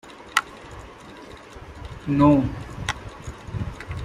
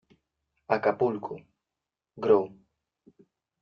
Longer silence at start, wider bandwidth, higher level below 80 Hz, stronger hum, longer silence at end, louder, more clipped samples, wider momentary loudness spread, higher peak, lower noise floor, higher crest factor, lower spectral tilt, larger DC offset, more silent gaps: second, 0.05 s vs 0.7 s; first, 15 kHz vs 5.8 kHz; first, -42 dBFS vs -72 dBFS; neither; second, 0 s vs 1.15 s; first, -24 LUFS vs -27 LUFS; neither; first, 24 LU vs 16 LU; first, 0 dBFS vs -8 dBFS; second, -42 dBFS vs -88 dBFS; about the same, 26 dB vs 22 dB; about the same, -6 dB/octave vs -5.5 dB/octave; neither; neither